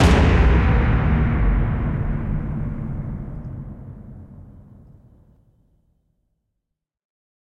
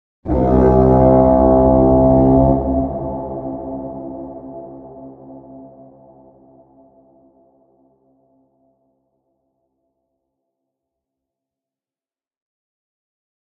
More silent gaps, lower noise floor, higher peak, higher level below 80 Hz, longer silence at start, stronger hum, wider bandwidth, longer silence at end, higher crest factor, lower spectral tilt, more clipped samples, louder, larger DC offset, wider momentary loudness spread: neither; second, -80 dBFS vs under -90 dBFS; about the same, -2 dBFS vs 0 dBFS; first, -24 dBFS vs -30 dBFS; second, 0 s vs 0.25 s; neither; first, 10.5 kHz vs 2.5 kHz; second, 2.95 s vs 7.9 s; about the same, 18 dB vs 18 dB; second, -7.5 dB/octave vs -12.5 dB/octave; neither; second, -21 LUFS vs -14 LUFS; neither; about the same, 23 LU vs 23 LU